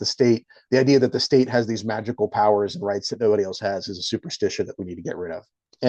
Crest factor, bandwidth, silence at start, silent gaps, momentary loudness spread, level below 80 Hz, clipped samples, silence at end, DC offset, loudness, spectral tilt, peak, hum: 18 dB; 8.6 kHz; 0 s; none; 12 LU; -66 dBFS; under 0.1%; 0 s; under 0.1%; -22 LUFS; -5 dB/octave; -6 dBFS; none